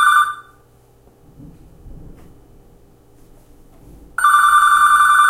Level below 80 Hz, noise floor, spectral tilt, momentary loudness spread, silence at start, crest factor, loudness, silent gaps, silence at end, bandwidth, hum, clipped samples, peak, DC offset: -46 dBFS; -50 dBFS; 0.5 dB/octave; 15 LU; 0 s; 16 dB; -12 LUFS; none; 0 s; 16 kHz; none; under 0.1%; -2 dBFS; under 0.1%